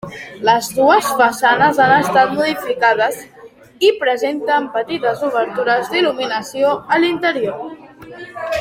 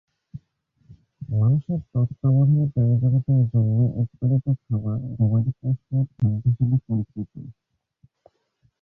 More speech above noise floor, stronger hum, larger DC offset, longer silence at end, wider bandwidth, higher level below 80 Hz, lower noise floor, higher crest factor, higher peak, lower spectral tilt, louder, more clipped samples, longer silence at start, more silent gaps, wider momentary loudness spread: second, 20 dB vs 46 dB; neither; neither; second, 0 s vs 1.3 s; first, 16.5 kHz vs 1.4 kHz; second, -58 dBFS vs -50 dBFS; second, -35 dBFS vs -67 dBFS; about the same, 16 dB vs 12 dB; first, 0 dBFS vs -10 dBFS; second, -4 dB/octave vs -14.5 dB/octave; first, -15 LUFS vs -22 LUFS; neither; second, 0.05 s vs 0.35 s; neither; about the same, 11 LU vs 9 LU